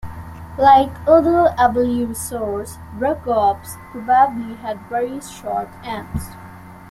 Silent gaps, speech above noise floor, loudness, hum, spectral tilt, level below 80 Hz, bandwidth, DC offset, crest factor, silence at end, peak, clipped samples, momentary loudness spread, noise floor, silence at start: none; 20 dB; -18 LUFS; none; -5.5 dB/octave; -42 dBFS; 15.5 kHz; under 0.1%; 18 dB; 0 s; -2 dBFS; under 0.1%; 20 LU; -38 dBFS; 0.05 s